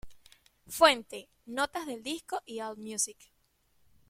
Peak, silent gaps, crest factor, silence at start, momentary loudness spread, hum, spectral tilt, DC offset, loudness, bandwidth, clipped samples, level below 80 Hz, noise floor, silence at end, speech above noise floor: -8 dBFS; none; 26 dB; 0.05 s; 17 LU; none; -1 dB/octave; under 0.1%; -30 LUFS; 16.5 kHz; under 0.1%; -64 dBFS; -71 dBFS; 0.95 s; 39 dB